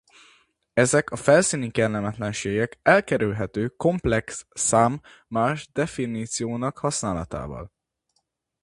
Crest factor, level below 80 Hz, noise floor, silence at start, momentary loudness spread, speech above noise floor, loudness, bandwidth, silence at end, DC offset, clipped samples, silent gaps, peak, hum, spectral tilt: 22 dB; -48 dBFS; -74 dBFS; 0.75 s; 11 LU; 51 dB; -23 LUFS; 11.5 kHz; 0.95 s; under 0.1%; under 0.1%; none; -2 dBFS; none; -4.5 dB/octave